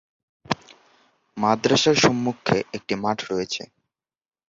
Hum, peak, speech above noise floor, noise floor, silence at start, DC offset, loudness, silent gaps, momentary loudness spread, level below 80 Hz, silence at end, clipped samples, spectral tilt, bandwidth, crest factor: none; -4 dBFS; 59 dB; -81 dBFS; 0.5 s; under 0.1%; -22 LUFS; none; 12 LU; -58 dBFS; 0.85 s; under 0.1%; -4 dB/octave; 7.8 kHz; 20 dB